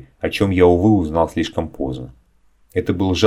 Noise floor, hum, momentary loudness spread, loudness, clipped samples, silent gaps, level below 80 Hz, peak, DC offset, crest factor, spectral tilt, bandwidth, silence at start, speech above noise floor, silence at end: -56 dBFS; none; 13 LU; -18 LUFS; under 0.1%; none; -38 dBFS; 0 dBFS; under 0.1%; 18 dB; -6.5 dB/octave; 15.5 kHz; 0.25 s; 39 dB; 0 s